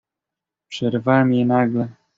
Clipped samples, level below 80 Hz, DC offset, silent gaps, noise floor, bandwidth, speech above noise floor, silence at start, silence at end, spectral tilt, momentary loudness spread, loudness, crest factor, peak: under 0.1%; -60 dBFS; under 0.1%; none; -86 dBFS; 7.6 kHz; 68 dB; 0.7 s; 0.25 s; -6 dB/octave; 9 LU; -19 LUFS; 16 dB; -4 dBFS